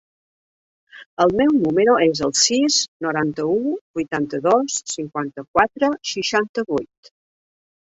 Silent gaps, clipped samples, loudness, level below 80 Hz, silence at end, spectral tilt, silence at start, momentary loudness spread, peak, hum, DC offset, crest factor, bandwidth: 1.06-1.17 s, 2.88-3.00 s, 3.81-3.94 s, 5.48-5.54 s, 6.49-6.54 s; under 0.1%; -19 LUFS; -58 dBFS; 1 s; -3 dB/octave; 0.95 s; 10 LU; -2 dBFS; none; under 0.1%; 18 dB; 8.2 kHz